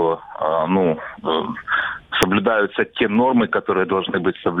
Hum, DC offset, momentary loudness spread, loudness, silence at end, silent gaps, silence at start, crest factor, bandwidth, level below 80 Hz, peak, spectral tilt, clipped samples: none; under 0.1%; 6 LU; -20 LUFS; 0 s; none; 0 s; 20 dB; 18 kHz; -50 dBFS; 0 dBFS; -5.5 dB/octave; under 0.1%